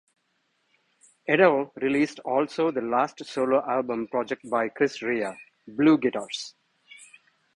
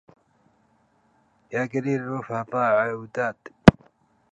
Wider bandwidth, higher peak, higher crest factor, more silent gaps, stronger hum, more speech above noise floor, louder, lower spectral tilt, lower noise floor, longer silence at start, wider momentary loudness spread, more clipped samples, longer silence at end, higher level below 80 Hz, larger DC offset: about the same, 11 kHz vs 10.5 kHz; second, -6 dBFS vs 0 dBFS; about the same, 22 dB vs 24 dB; neither; neither; first, 48 dB vs 39 dB; about the same, -25 LUFS vs -23 LUFS; second, -5.5 dB/octave vs -7.5 dB/octave; first, -72 dBFS vs -64 dBFS; second, 1.3 s vs 1.5 s; about the same, 13 LU vs 13 LU; neither; about the same, 0.5 s vs 0.6 s; second, -68 dBFS vs -44 dBFS; neither